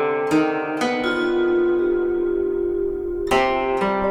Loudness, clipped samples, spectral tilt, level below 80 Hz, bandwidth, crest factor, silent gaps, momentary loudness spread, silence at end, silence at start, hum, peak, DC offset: -21 LUFS; under 0.1%; -5.5 dB/octave; -42 dBFS; 12.5 kHz; 16 dB; none; 4 LU; 0 s; 0 s; none; -4 dBFS; under 0.1%